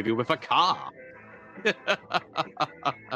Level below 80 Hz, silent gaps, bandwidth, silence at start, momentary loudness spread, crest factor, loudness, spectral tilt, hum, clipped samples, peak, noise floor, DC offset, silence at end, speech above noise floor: -70 dBFS; none; 15 kHz; 0 s; 23 LU; 20 dB; -27 LUFS; -4.5 dB/octave; none; under 0.1%; -8 dBFS; -48 dBFS; under 0.1%; 0 s; 20 dB